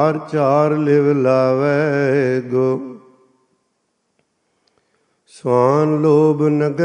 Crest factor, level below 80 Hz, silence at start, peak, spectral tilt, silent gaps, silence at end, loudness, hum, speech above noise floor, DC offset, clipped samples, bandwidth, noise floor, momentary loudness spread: 16 dB; -66 dBFS; 0 s; -2 dBFS; -8.5 dB/octave; none; 0 s; -16 LUFS; none; 54 dB; under 0.1%; under 0.1%; 9.8 kHz; -69 dBFS; 5 LU